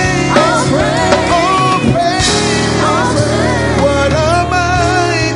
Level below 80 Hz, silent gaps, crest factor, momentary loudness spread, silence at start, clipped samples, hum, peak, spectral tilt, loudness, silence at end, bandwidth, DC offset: -28 dBFS; none; 12 dB; 2 LU; 0 s; under 0.1%; none; 0 dBFS; -4.5 dB/octave; -11 LUFS; 0 s; 11 kHz; under 0.1%